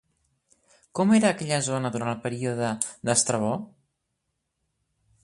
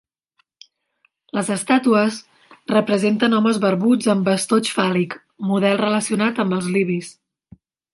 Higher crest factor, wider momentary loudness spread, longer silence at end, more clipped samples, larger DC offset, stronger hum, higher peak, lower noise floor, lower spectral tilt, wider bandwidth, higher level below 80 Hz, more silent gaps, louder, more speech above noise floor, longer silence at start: first, 24 dB vs 18 dB; about the same, 9 LU vs 10 LU; first, 1.55 s vs 0.8 s; neither; neither; neither; about the same, -4 dBFS vs -2 dBFS; first, -79 dBFS vs -67 dBFS; about the same, -4.5 dB/octave vs -5 dB/octave; about the same, 11.5 kHz vs 11.5 kHz; about the same, -66 dBFS vs -66 dBFS; neither; second, -25 LUFS vs -19 LUFS; first, 54 dB vs 49 dB; second, 0.95 s vs 1.35 s